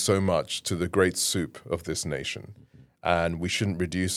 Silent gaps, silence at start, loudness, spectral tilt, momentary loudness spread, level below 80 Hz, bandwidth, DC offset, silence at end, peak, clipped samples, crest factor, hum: none; 0 s; -27 LUFS; -4 dB/octave; 10 LU; -56 dBFS; 16 kHz; under 0.1%; 0 s; -6 dBFS; under 0.1%; 22 dB; none